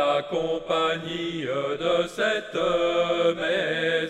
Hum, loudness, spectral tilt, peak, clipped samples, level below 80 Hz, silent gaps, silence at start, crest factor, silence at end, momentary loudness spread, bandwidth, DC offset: none; -25 LUFS; -4.5 dB/octave; -10 dBFS; under 0.1%; -56 dBFS; none; 0 s; 14 dB; 0 s; 5 LU; 12 kHz; under 0.1%